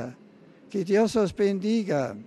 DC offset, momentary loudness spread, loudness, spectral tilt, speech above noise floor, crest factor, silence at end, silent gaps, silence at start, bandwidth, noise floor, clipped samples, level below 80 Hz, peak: under 0.1%; 11 LU; -25 LUFS; -6.5 dB/octave; 28 dB; 14 dB; 0.05 s; none; 0 s; 12.5 kHz; -52 dBFS; under 0.1%; -60 dBFS; -12 dBFS